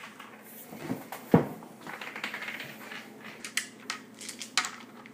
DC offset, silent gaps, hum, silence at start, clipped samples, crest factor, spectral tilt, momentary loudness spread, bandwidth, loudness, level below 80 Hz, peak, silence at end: under 0.1%; none; none; 0 s; under 0.1%; 30 dB; -4 dB/octave; 19 LU; 15.5 kHz; -34 LUFS; -70 dBFS; -4 dBFS; 0 s